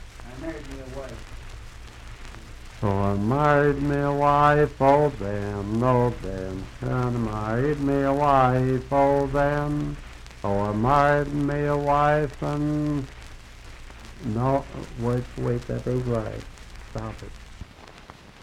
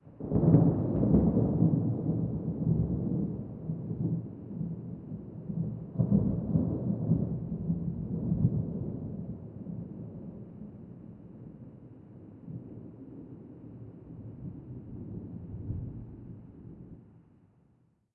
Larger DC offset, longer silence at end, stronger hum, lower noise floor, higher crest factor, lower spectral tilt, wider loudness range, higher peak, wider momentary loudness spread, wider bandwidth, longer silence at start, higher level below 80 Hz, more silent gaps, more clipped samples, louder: neither; second, 0.1 s vs 0.95 s; neither; second, -46 dBFS vs -68 dBFS; about the same, 20 dB vs 24 dB; second, -7.5 dB/octave vs -14.5 dB/octave; second, 8 LU vs 17 LU; first, -4 dBFS vs -10 dBFS; about the same, 24 LU vs 22 LU; first, 13.5 kHz vs 1.9 kHz; about the same, 0 s vs 0.05 s; first, -40 dBFS vs -48 dBFS; neither; neither; first, -23 LUFS vs -31 LUFS